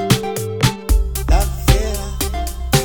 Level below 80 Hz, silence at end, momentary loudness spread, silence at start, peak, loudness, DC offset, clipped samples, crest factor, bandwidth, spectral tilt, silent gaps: -20 dBFS; 0 s; 6 LU; 0 s; 0 dBFS; -19 LUFS; under 0.1%; under 0.1%; 16 dB; over 20 kHz; -4.5 dB/octave; none